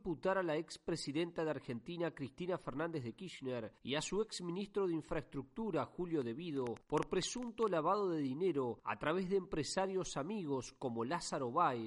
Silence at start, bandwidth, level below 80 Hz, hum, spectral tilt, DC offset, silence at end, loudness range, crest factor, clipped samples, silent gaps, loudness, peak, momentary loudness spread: 0.05 s; 11.5 kHz; -64 dBFS; none; -5 dB/octave; under 0.1%; 0 s; 4 LU; 18 dB; under 0.1%; none; -40 LUFS; -20 dBFS; 8 LU